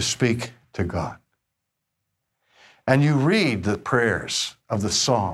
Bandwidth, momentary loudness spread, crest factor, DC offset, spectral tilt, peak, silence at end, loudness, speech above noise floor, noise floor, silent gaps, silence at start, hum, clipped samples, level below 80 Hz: 14.5 kHz; 11 LU; 18 dB; under 0.1%; -4.5 dB/octave; -6 dBFS; 0 s; -22 LUFS; 58 dB; -80 dBFS; none; 0 s; none; under 0.1%; -50 dBFS